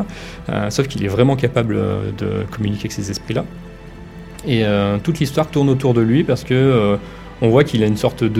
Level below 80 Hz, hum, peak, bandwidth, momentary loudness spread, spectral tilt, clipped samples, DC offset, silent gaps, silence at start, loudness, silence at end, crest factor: -40 dBFS; none; 0 dBFS; 15 kHz; 16 LU; -7 dB/octave; under 0.1%; under 0.1%; none; 0 s; -18 LUFS; 0 s; 18 dB